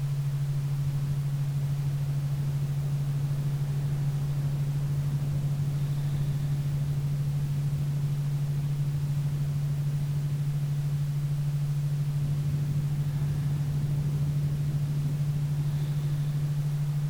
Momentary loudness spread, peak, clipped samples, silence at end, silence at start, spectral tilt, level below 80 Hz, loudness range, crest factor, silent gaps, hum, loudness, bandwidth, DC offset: 1 LU; -18 dBFS; under 0.1%; 0 s; 0 s; -8 dB/octave; -46 dBFS; 1 LU; 10 dB; none; none; -29 LUFS; 16 kHz; under 0.1%